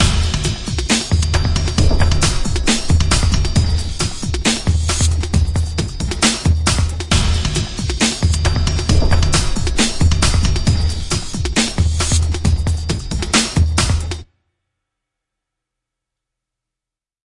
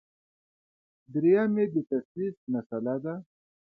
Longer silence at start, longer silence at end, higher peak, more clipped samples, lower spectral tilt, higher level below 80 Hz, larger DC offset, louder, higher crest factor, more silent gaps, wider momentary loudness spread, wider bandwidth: second, 0 s vs 1.1 s; first, 3.05 s vs 0.55 s; first, 0 dBFS vs -12 dBFS; neither; second, -4 dB/octave vs -11.5 dB/octave; first, -22 dBFS vs -76 dBFS; neither; first, -17 LUFS vs -29 LUFS; about the same, 16 dB vs 18 dB; second, none vs 2.05-2.15 s, 2.37-2.47 s, 2.66-2.70 s; second, 6 LU vs 12 LU; first, 11.5 kHz vs 4.2 kHz